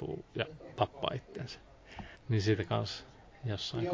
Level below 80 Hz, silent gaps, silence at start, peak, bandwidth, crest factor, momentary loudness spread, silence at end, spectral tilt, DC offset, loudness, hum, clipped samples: -56 dBFS; none; 0 s; -14 dBFS; 7.6 kHz; 22 dB; 18 LU; 0 s; -6 dB/octave; under 0.1%; -36 LUFS; none; under 0.1%